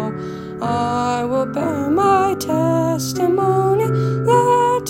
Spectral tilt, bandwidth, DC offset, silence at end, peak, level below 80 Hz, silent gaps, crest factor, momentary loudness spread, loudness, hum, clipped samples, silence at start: -6.5 dB/octave; 16.5 kHz; under 0.1%; 0 s; -2 dBFS; -52 dBFS; none; 16 dB; 7 LU; -17 LUFS; none; under 0.1%; 0 s